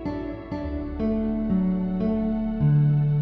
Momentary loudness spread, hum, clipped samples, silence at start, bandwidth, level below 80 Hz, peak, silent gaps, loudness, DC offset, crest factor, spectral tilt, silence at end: 11 LU; none; under 0.1%; 0 s; 5 kHz; -38 dBFS; -12 dBFS; none; -25 LUFS; under 0.1%; 12 dB; -12 dB/octave; 0 s